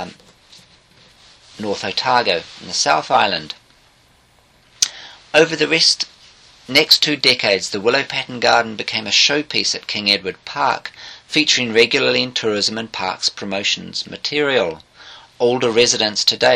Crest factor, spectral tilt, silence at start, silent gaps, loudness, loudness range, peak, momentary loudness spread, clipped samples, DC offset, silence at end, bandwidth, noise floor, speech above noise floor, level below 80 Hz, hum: 18 dB; -2 dB/octave; 0 s; none; -16 LUFS; 5 LU; 0 dBFS; 11 LU; under 0.1%; under 0.1%; 0 s; 15.5 kHz; -54 dBFS; 36 dB; -58 dBFS; none